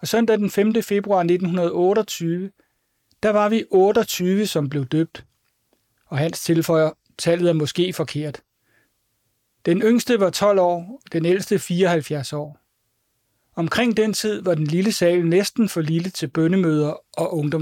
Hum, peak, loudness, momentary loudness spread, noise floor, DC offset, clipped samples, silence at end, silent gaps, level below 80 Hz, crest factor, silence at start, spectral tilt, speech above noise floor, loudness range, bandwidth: none; -6 dBFS; -20 LUFS; 9 LU; -70 dBFS; under 0.1%; under 0.1%; 0 s; none; -62 dBFS; 14 dB; 0 s; -5.5 dB/octave; 51 dB; 3 LU; 17 kHz